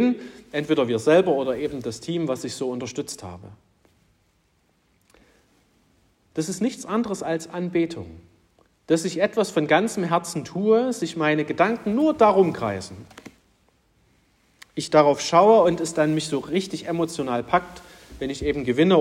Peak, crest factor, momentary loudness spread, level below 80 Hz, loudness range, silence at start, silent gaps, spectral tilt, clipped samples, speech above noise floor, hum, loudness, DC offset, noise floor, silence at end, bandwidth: -4 dBFS; 20 dB; 15 LU; -56 dBFS; 11 LU; 0 s; none; -5.5 dB/octave; under 0.1%; 43 dB; none; -22 LUFS; under 0.1%; -65 dBFS; 0 s; 15.5 kHz